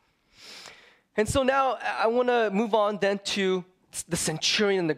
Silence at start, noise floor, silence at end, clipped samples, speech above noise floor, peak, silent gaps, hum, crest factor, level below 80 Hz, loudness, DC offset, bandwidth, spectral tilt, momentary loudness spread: 0.4 s; -53 dBFS; 0 s; under 0.1%; 28 dB; -8 dBFS; none; none; 18 dB; -52 dBFS; -25 LUFS; under 0.1%; 16 kHz; -3.5 dB/octave; 15 LU